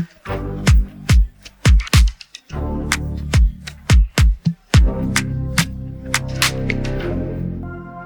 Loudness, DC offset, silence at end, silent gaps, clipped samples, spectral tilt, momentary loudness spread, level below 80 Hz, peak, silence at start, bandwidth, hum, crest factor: -19 LUFS; under 0.1%; 0 s; none; under 0.1%; -4.5 dB/octave; 12 LU; -20 dBFS; 0 dBFS; 0 s; 19.5 kHz; none; 16 dB